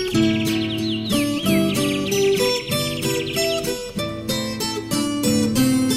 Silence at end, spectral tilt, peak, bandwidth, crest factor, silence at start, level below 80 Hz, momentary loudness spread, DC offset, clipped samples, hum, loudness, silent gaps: 0 s; -4.5 dB/octave; -6 dBFS; 16 kHz; 14 dB; 0 s; -46 dBFS; 6 LU; under 0.1%; under 0.1%; none; -21 LUFS; none